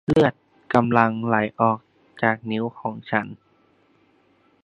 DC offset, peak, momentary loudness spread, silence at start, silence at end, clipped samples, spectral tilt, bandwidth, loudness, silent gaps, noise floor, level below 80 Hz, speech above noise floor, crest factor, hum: under 0.1%; 0 dBFS; 10 LU; 0.1 s; 1.3 s; under 0.1%; -8 dB/octave; 10 kHz; -22 LUFS; none; -61 dBFS; -54 dBFS; 40 dB; 22 dB; none